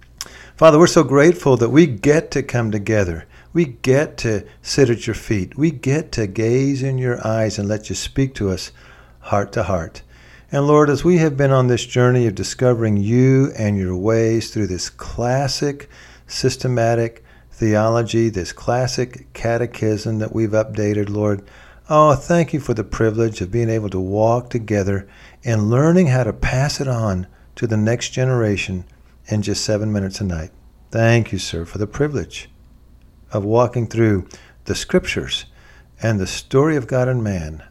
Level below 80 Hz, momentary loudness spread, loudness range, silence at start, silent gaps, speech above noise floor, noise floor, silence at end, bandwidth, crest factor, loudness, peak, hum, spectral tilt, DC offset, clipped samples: -40 dBFS; 12 LU; 5 LU; 0.2 s; none; 29 dB; -47 dBFS; 0.1 s; 13 kHz; 18 dB; -18 LUFS; 0 dBFS; none; -6 dB/octave; under 0.1%; under 0.1%